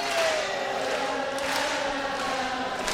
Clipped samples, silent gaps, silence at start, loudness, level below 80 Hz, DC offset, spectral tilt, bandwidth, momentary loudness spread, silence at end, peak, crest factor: under 0.1%; none; 0 s; -27 LUFS; -56 dBFS; under 0.1%; -2 dB/octave; 16 kHz; 4 LU; 0 s; -6 dBFS; 20 dB